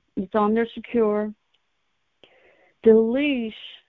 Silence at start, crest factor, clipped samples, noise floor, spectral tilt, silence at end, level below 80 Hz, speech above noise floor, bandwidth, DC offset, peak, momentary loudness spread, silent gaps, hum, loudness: 0.15 s; 18 dB; under 0.1%; -74 dBFS; -9 dB/octave; 0.15 s; -58 dBFS; 53 dB; 4.1 kHz; under 0.1%; -4 dBFS; 10 LU; none; none; -22 LUFS